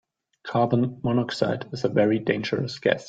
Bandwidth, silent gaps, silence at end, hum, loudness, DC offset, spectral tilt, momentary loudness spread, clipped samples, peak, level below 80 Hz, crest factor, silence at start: 9 kHz; none; 0 s; none; -25 LUFS; under 0.1%; -7 dB/octave; 6 LU; under 0.1%; -6 dBFS; -60 dBFS; 20 dB; 0.45 s